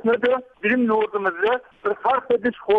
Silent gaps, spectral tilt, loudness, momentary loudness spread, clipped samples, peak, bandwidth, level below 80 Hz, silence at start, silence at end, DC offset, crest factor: none; -7 dB/octave; -22 LUFS; 4 LU; under 0.1%; -10 dBFS; 4.9 kHz; -62 dBFS; 0.05 s; 0 s; under 0.1%; 12 dB